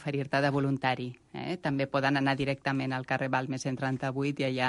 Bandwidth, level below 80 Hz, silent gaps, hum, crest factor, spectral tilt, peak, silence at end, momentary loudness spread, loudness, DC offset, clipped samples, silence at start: 11.5 kHz; -64 dBFS; none; none; 18 dB; -6 dB/octave; -12 dBFS; 0 s; 7 LU; -30 LUFS; under 0.1%; under 0.1%; 0 s